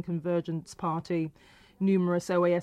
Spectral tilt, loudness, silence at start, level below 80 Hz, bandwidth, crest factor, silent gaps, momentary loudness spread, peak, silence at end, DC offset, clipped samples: -7.5 dB/octave; -30 LUFS; 0 s; -66 dBFS; 12 kHz; 12 dB; none; 8 LU; -16 dBFS; 0 s; under 0.1%; under 0.1%